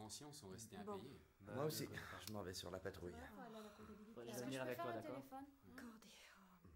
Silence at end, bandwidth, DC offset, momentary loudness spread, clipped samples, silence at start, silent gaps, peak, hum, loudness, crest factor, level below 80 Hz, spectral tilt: 0 s; 16 kHz; under 0.1%; 14 LU; under 0.1%; 0 s; none; -32 dBFS; none; -52 LUFS; 20 dB; -78 dBFS; -4.5 dB/octave